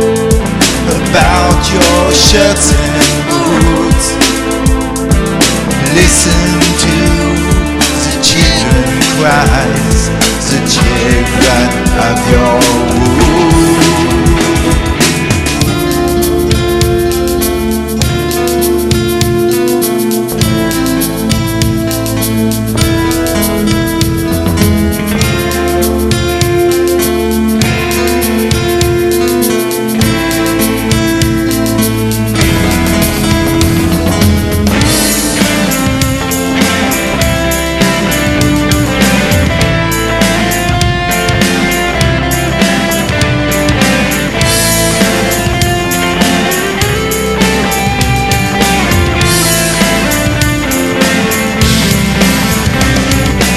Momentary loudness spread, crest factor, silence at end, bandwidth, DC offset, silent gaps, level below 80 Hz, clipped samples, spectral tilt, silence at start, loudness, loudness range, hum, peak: 4 LU; 10 dB; 0 s; 15 kHz; under 0.1%; none; -20 dBFS; 0.3%; -4 dB/octave; 0 s; -10 LUFS; 3 LU; none; 0 dBFS